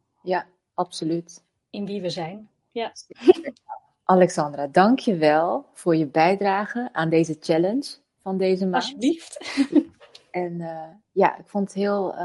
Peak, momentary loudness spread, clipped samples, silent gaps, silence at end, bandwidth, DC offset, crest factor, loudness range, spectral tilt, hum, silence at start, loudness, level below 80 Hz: 0 dBFS; 16 LU; under 0.1%; none; 0 s; 11.5 kHz; under 0.1%; 22 dB; 5 LU; -6 dB/octave; none; 0.25 s; -23 LUFS; -70 dBFS